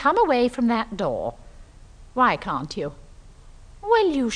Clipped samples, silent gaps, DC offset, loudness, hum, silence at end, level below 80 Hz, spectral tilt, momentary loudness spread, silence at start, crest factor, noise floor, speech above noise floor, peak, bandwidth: under 0.1%; none; under 0.1%; -23 LUFS; none; 0 s; -46 dBFS; -5.5 dB/octave; 14 LU; 0 s; 18 dB; -46 dBFS; 24 dB; -6 dBFS; 10 kHz